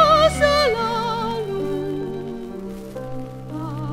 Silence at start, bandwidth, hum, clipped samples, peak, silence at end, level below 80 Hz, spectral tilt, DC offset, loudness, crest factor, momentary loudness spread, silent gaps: 0 s; 16 kHz; none; under 0.1%; -2 dBFS; 0 s; -40 dBFS; -5 dB/octave; under 0.1%; -21 LUFS; 18 dB; 17 LU; none